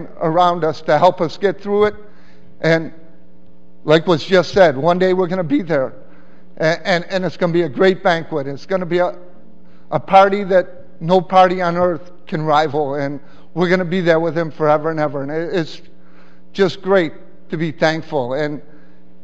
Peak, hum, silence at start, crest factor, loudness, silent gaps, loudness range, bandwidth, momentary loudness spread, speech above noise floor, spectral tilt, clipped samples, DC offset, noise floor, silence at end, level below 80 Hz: 0 dBFS; none; 0 s; 18 dB; -17 LUFS; none; 4 LU; 8 kHz; 12 LU; 33 dB; -6.5 dB/octave; under 0.1%; 3%; -49 dBFS; 0.65 s; -56 dBFS